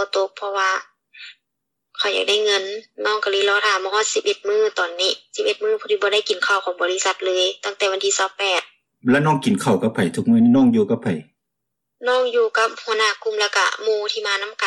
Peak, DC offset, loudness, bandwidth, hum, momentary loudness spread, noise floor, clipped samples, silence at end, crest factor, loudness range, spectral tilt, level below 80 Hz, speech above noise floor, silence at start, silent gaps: -8 dBFS; under 0.1%; -19 LUFS; 12.5 kHz; none; 6 LU; -80 dBFS; under 0.1%; 0 s; 12 dB; 2 LU; -3.5 dB/octave; -66 dBFS; 61 dB; 0 s; none